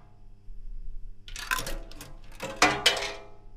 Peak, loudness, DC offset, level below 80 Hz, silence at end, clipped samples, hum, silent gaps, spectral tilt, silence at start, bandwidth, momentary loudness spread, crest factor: -6 dBFS; -26 LUFS; under 0.1%; -42 dBFS; 0 s; under 0.1%; none; none; -1.5 dB/octave; 0 s; 16 kHz; 25 LU; 26 dB